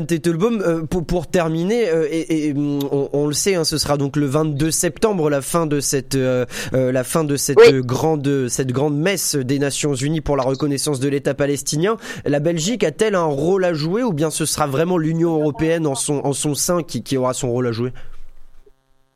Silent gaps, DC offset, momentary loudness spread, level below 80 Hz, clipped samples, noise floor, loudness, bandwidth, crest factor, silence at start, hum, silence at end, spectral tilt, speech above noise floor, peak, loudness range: none; under 0.1%; 3 LU; -42 dBFS; under 0.1%; -53 dBFS; -19 LUFS; 15.5 kHz; 16 dB; 0 s; none; 0.55 s; -5 dB/octave; 35 dB; -2 dBFS; 3 LU